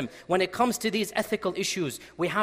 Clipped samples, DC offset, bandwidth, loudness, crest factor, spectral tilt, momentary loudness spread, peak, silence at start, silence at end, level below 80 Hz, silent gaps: under 0.1%; under 0.1%; 16 kHz; -28 LUFS; 16 dB; -3.5 dB/octave; 6 LU; -12 dBFS; 0 s; 0 s; -62 dBFS; none